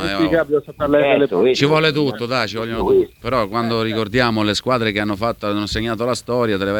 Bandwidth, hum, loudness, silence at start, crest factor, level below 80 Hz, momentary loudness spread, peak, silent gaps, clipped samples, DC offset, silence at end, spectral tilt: 19 kHz; none; -18 LUFS; 0 s; 16 dB; -42 dBFS; 6 LU; -2 dBFS; none; under 0.1%; under 0.1%; 0 s; -5.5 dB/octave